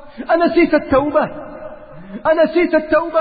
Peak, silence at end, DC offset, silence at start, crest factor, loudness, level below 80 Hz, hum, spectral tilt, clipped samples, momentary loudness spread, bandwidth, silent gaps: -2 dBFS; 0 s; under 0.1%; 0 s; 14 dB; -15 LUFS; -42 dBFS; none; -4 dB/octave; under 0.1%; 19 LU; 4.9 kHz; none